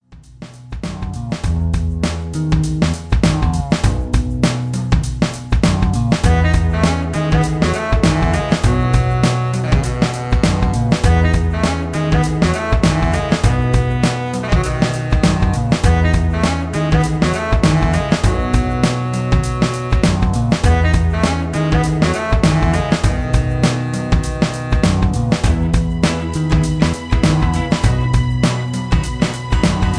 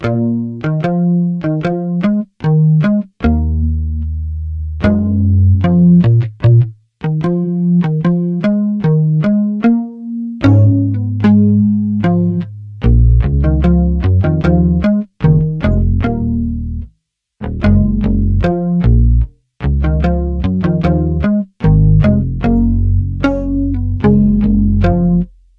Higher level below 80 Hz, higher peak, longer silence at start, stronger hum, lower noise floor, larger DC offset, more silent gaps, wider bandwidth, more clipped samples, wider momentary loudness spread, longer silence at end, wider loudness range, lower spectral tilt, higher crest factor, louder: about the same, -20 dBFS vs -20 dBFS; about the same, 0 dBFS vs 0 dBFS; about the same, 0.1 s vs 0 s; neither; second, -37 dBFS vs -61 dBFS; neither; neither; first, 10.5 kHz vs 5.8 kHz; neither; second, 5 LU vs 8 LU; second, 0 s vs 0.3 s; about the same, 2 LU vs 3 LU; second, -6 dB/octave vs -10.5 dB/octave; about the same, 14 dB vs 12 dB; second, -16 LUFS vs -13 LUFS